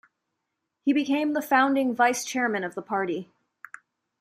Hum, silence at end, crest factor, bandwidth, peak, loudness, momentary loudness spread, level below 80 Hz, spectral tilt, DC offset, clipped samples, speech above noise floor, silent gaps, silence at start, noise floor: none; 0.95 s; 20 dB; 15.5 kHz; -8 dBFS; -25 LUFS; 14 LU; -80 dBFS; -3.5 dB/octave; under 0.1%; under 0.1%; 57 dB; none; 0.85 s; -81 dBFS